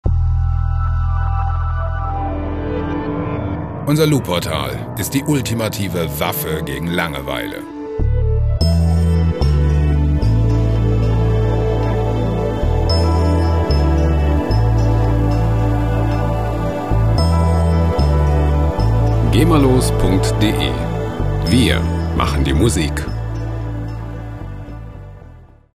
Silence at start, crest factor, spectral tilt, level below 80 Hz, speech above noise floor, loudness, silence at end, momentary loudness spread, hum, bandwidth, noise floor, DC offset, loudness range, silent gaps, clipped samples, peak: 0.05 s; 16 dB; -6.5 dB/octave; -20 dBFS; 24 dB; -17 LUFS; 0.3 s; 9 LU; none; 15.5 kHz; -40 dBFS; under 0.1%; 5 LU; none; under 0.1%; 0 dBFS